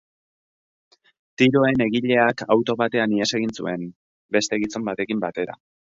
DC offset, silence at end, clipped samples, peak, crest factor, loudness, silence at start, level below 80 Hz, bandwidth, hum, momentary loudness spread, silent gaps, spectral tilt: under 0.1%; 0.4 s; under 0.1%; -4 dBFS; 20 dB; -22 LUFS; 1.4 s; -60 dBFS; 7.8 kHz; none; 10 LU; 3.96-4.29 s; -5 dB/octave